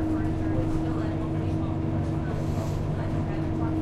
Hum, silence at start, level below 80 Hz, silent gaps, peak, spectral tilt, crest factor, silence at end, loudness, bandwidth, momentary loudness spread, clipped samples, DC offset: none; 0 s; -36 dBFS; none; -16 dBFS; -8.5 dB/octave; 12 dB; 0 s; -28 LUFS; 11 kHz; 2 LU; under 0.1%; under 0.1%